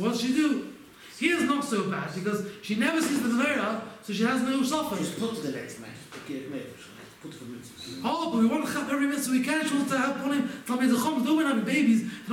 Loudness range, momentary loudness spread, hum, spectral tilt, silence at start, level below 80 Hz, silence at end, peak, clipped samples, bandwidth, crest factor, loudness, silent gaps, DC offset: 7 LU; 18 LU; none; -4.5 dB/octave; 0 s; -68 dBFS; 0 s; -10 dBFS; under 0.1%; 17 kHz; 16 dB; -27 LUFS; none; under 0.1%